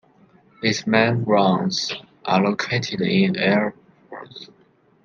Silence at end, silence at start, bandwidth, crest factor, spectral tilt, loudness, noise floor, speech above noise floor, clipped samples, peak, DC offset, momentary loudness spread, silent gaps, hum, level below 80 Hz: 0.6 s; 0.6 s; 7.4 kHz; 20 dB; -5.5 dB/octave; -20 LUFS; -55 dBFS; 35 dB; under 0.1%; -2 dBFS; under 0.1%; 20 LU; none; none; -62 dBFS